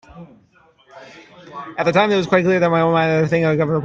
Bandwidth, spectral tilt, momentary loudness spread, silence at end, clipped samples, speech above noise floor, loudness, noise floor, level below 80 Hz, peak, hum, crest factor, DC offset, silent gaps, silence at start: 7.4 kHz; -7 dB/octave; 13 LU; 0 s; under 0.1%; 33 dB; -16 LUFS; -51 dBFS; -56 dBFS; 0 dBFS; none; 18 dB; under 0.1%; none; 0.15 s